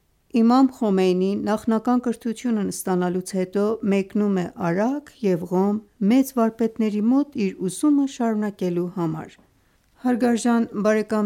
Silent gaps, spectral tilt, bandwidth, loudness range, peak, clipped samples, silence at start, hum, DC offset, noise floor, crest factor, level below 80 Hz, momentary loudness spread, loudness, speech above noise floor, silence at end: none; -6.5 dB/octave; 16 kHz; 2 LU; -8 dBFS; under 0.1%; 0.35 s; none; under 0.1%; -61 dBFS; 14 dB; -64 dBFS; 6 LU; -22 LUFS; 40 dB; 0 s